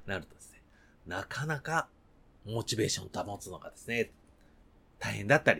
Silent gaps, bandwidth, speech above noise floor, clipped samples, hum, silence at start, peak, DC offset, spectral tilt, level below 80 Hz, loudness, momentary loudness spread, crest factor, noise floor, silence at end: none; 18.5 kHz; 28 dB; under 0.1%; none; 0 s; -8 dBFS; under 0.1%; -4 dB/octave; -60 dBFS; -34 LUFS; 20 LU; 28 dB; -61 dBFS; 0 s